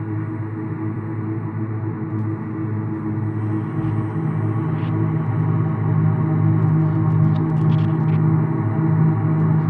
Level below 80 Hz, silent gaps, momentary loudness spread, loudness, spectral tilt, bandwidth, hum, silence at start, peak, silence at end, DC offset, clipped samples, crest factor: -52 dBFS; none; 8 LU; -20 LUFS; -11.5 dB/octave; 3.6 kHz; none; 0 s; -8 dBFS; 0 s; under 0.1%; under 0.1%; 12 dB